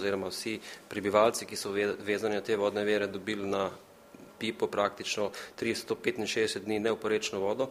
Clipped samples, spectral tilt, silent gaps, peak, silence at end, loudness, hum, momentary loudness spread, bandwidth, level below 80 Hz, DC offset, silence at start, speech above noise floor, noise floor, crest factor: under 0.1%; -3.5 dB/octave; none; -10 dBFS; 0 s; -31 LUFS; none; 8 LU; 15.5 kHz; -70 dBFS; under 0.1%; 0 s; 22 dB; -53 dBFS; 22 dB